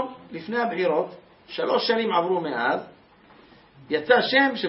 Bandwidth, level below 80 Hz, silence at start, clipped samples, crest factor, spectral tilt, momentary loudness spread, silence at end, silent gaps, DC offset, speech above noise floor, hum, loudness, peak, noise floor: 5.8 kHz; -70 dBFS; 0 s; under 0.1%; 20 dB; -8 dB/octave; 13 LU; 0 s; none; under 0.1%; 30 dB; none; -23 LUFS; -4 dBFS; -53 dBFS